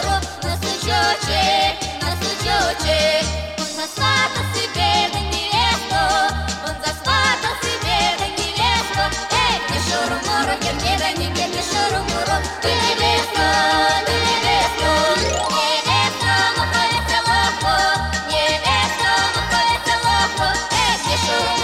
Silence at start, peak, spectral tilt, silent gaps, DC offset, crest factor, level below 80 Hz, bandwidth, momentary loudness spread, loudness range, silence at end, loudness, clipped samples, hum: 0 s; -6 dBFS; -2.5 dB/octave; none; under 0.1%; 14 dB; -34 dBFS; 16.5 kHz; 5 LU; 2 LU; 0 s; -18 LUFS; under 0.1%; none